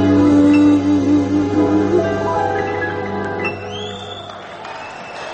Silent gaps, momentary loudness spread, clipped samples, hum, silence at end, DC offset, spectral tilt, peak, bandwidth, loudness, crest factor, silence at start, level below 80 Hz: none; 18 LU; under 0.1%; none; 0 s; under 0.1%; -7 dB/octave; -4 dBFS; 8.4 kHz; -16 LUFS; 12 dB; 0 s; -48 dBFS